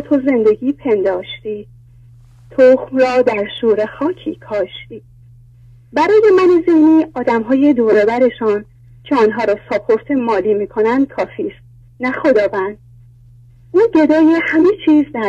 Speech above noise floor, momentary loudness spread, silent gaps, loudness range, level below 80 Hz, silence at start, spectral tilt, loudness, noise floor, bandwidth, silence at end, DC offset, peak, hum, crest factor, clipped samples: 30 dB; 12 LU; none; 5 LU; -50 dBFS; 0 s; -7 dB/octave; -14 LUFS; -43 dBFS; 7.8 kHz; 0 s; under 0.1%; 0 dBFS; none; 14 dB; under 0.1%